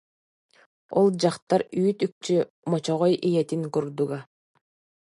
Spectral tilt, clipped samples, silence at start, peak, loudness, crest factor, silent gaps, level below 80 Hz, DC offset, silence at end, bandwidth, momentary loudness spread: -6.5 dB/octave; under 0.1%; 0.9 s; -8 dBFS; -25 LUFS; 18 dB; 1.42-1.47 s, 2.12-2.21 s, 2.50-2.63 s; -74 dBFS; under 0.1%; 0.85 s; 11.5 kHz; 7 LU